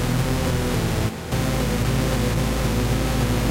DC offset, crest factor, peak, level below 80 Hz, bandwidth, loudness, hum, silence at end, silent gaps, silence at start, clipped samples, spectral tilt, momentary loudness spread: under 0.1%; 12 dB; -10 dBFS; -28 dBFS; 16 kHz; -23 LUFS; none; 0 s; none; 0 s; under 0.1%; -5.5 dB/octave; 2 LU